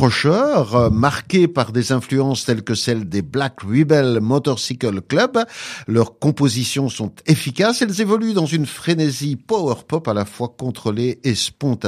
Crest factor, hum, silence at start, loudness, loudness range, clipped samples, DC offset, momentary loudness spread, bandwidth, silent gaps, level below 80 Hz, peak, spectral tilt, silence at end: 18 dB; none; 0 s; -18 LUFS; 2 LU; under 0.1%; under 0.1%; 7 LU; 15 kHz; none; -48 dBFS; 0 dBFS; -5.5 dB/octave; 0 s